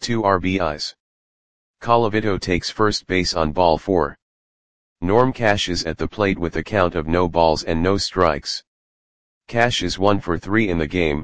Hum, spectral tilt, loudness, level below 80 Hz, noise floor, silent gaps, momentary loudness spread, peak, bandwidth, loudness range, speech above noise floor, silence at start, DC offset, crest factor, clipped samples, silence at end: none; -5 dB/octave; -20 LUFS; -40 dBFS; under -90 dBFS; 1.00-1.74 s, 4.22-4.96 s, 8.67-9.41 s; 8 LU; 0 dBFS; 9.8 kHz; 2 LU; over 71 dB; 0 s; 2%; 20 dB; under 0.1%; 0 s